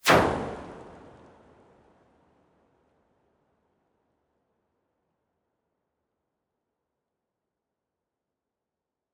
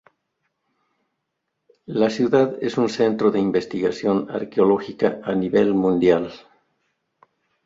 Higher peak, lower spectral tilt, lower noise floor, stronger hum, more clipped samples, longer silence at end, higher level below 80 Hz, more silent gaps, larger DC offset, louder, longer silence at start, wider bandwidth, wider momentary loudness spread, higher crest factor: about the same, -6 dBFS vs -4 dBFS; second, -4 dB/octave vs -7 dB/octave; first, -88 dBFS vs -78 dBFS; neither; neither; first, 8.25 s vs 1.3 s; about the same, -56 dBFS vs -60 dBFS; neither; neither; second, -25 LUFS vs -20 LUFS; second, 0.05 s vs 1.9 s; first, 10.5 kHz vs 7.8 kHz; first, 28 LU vs 6 LU; first, 30 dB vs 18 dB